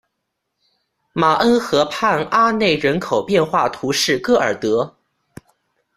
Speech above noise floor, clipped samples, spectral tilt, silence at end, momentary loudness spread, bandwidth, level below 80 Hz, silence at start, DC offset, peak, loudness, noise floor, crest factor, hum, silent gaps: 59 dB; under 0.1%; -4 dB/octave; 1.1 s; 5 LU; 15 kHz; -54 dBFS; 1.15 s; under 0.1%; -2 dBFS; -17 LUFS; -76 dBFS; 16 dB; none; none